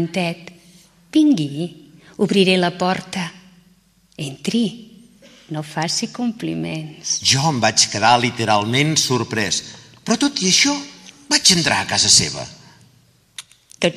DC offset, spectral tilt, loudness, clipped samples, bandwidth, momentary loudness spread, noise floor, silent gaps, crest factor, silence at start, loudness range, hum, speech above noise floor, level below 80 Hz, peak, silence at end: under 0.1%; -3 dB/octave; -17 LUFS; under 0.1%; 14.5 kHz; 18 LU; -56 dBFS; none; 20 dB; 0 s; 9 LU; none; 37 dB; -56 dBFS; 0 dBFS; 0 s